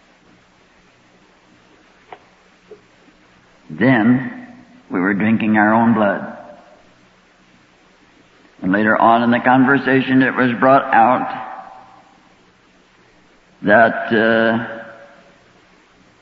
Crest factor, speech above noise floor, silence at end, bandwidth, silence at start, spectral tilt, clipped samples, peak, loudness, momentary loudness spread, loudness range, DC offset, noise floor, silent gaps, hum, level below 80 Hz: 18 dB; 38 dB; 1.3 s; 5.8 kHz; 2.7 s; -8.5 dB/octave; under 0.1%; 0 dBFS; -15 LUFS; 18 LU; 7 LU; under 0.1%; -52 dBFS; none; none; -60 dBFS